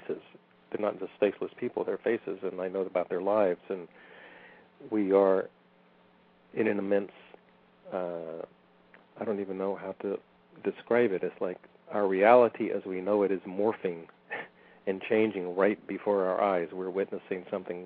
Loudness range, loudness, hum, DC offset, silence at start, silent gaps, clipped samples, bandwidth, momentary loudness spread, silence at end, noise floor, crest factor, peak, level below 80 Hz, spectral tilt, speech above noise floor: 8 LU; -30 LUFS; none; under 0.1%; 0.05 s; none; under 0.1%; 4.6 kHz; 15 LU; 0 s; -62 dBFS; 24 dB; -6 dBFS; -80 dBFS; -5 dB/octave; 33 dB